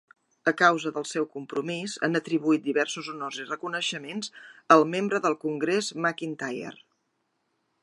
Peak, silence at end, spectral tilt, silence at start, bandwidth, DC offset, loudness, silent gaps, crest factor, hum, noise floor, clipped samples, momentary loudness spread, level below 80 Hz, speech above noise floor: -2 dBFS; 1.1 s; -4 dB/octave; 0.45 s; 11.5 kHz; under 0.1%; -26 LUFS; none; 24 dB; none; -76 dBFS; under 0.1%; 13 LU; -82 dBFS; 49 dB